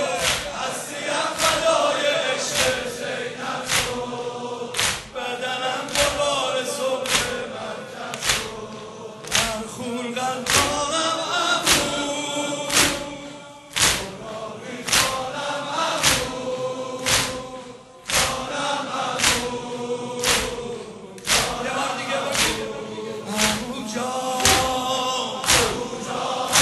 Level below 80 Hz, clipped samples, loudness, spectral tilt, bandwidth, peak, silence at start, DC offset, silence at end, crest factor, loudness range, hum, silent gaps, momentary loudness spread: -46 dBFS; under 0.1%; -22 LUFS; -1.5 dB/octave; 12.5 kHz; 0 dBFS; 0 s; under 0.1%; 0 s; 24 dB; 3 LU; none; none; 13 LU